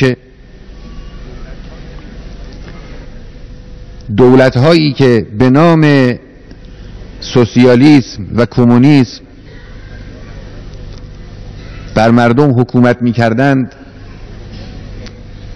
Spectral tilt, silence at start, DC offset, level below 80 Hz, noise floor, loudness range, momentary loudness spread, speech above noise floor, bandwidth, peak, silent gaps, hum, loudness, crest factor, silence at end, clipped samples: -7.5 dB/octave; 0 s; under 0.1%; -32 dBFS; -34 dBFS; 10 LU; 25 LU; 26 dB; 10 kHz; 0 dBFS; none; none; -9 LUFS; 12 dB; 0 s; 2%